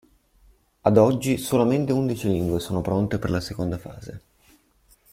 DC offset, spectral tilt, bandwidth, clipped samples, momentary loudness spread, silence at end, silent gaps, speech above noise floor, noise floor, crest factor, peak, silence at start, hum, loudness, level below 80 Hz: under 0.1%; -7 dB/octave; 16.5 kHz; under 0.1%; 14 LU; 0.95 s; none; 38 dB; -60 dBFS; 20 dB; -4 dBFS; 0.85 s; none; -23 LUFS; -48 dBFS